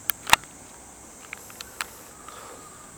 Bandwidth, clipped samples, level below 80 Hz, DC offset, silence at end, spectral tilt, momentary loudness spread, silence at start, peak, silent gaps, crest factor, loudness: over 20 kHz; under 0.1%; -54 dBFS; under 0.1%; 0 s; 0 dB/octave; 23 LU; 0 s; 0 dBFS; none; 32 dB; -25 LUFS